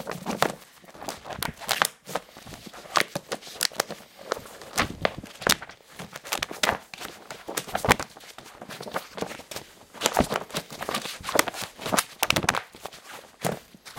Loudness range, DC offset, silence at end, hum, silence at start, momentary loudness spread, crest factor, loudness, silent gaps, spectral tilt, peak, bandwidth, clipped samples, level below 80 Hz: 3 LU; under 0.1%; 0 s; none; 0 s; 18 LU; 30 dB; -28 LUFS; none; -2.5 dB/octave; 0 dBFS; 17 kHz; under 0.1%; -50 dBFS